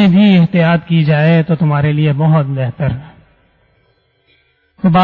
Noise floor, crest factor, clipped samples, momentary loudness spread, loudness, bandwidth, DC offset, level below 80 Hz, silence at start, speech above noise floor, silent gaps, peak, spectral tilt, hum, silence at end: -57 dBFS; 10 dB; under 0.1%; 9 LU; -12 LUFS; 4.8 kHz; under 0.1%; -44 dBFS; 0 s; 45 dB; none; -2 dBFS; -10 dB/octave; none; 0 s